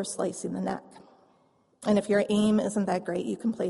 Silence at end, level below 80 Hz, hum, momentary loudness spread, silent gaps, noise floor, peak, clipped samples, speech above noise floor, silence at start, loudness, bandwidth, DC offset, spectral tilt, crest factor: 0 s; -64 dBFS; none; 9 LU; none; -66 dBFS; -12 dBFS; under 0.1%; 38 dB; 0 s; -28 LUFS; 11.5 kHz; under 0.1%; -5.5 dB/octave; 16 dB